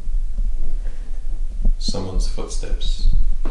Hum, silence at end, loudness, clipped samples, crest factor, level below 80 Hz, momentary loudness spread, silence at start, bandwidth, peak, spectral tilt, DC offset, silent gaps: none; 0 s; -27 LUFS; under 0.1%; 10 dB; -18 dBFS; 8 LU; 0 s; 9.8 kHz; -6 dBFS; -5 dB/octave; under 0.1%; none